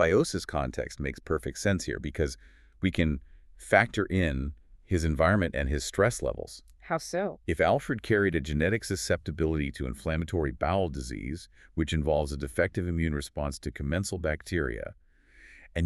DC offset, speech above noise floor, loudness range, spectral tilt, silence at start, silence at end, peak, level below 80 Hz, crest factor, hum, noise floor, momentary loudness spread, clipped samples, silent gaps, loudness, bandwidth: under 0.1%; 28 dB; 4 LU; -5.5 dB/octave; 0 s; 0 s; -6 dBFS; -40 dBFS; 24 dB; none; -56 dBFS; 11 LU; under 0.1%; none; -30 LUFS; 13.5 kHz